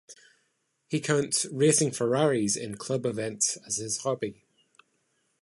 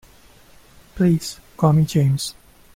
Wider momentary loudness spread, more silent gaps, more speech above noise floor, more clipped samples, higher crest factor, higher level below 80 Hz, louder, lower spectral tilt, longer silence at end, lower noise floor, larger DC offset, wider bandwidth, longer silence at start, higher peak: about the same, 9 LU vs 11 LU; neither; first, 47 dB vs 31 dB; neither; about the same, 20 dB vs 16 dB; second, -68 dBFS vs -48 dBFS; second, -27 LUFS vs -19 LUFS; second, -4 dB/octave vs -6.5 dB/octave; first, 1.1 s vs 0.45 s; first, -75 dBFS vs -49 dBFS; neither; second, 12 kHz vs 16 kHz; second, 0.1 s vs 0.95 s; second, -10 dBFS vs -6 dBFS